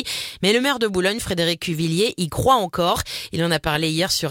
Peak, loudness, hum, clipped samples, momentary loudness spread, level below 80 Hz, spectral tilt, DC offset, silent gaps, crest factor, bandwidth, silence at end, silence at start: -4 dBFS; -20 LUFS; none; under 0.1%; 5 LU; -44 dBFS; -4 dB/octave; under 0.1%; none; 18 dB; 17 kHz; 0 s; 0 s